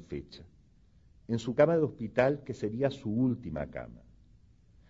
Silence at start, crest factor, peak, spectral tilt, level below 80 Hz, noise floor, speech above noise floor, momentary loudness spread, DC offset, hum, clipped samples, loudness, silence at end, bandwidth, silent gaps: 0 s; 22 dB; -10 dBFS; -7.5 dB/octave; -58 dBFS; -62 dBFS; 31 dB; 18 LU; under 0.1%; none; under 0.1%; -31 LUFS; 0.9 s; 7.8 kHz; none